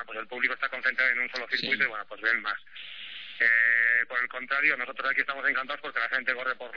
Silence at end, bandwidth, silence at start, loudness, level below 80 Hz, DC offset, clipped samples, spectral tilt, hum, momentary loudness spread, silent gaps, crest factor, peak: 0 s; 5.4 kHz; 0 s; -26 LUFS; -80 dBFS; 0.3%; under 0.1%; -3 dB/octave; none; 14 LU; none; 18 dB; -10 dBFS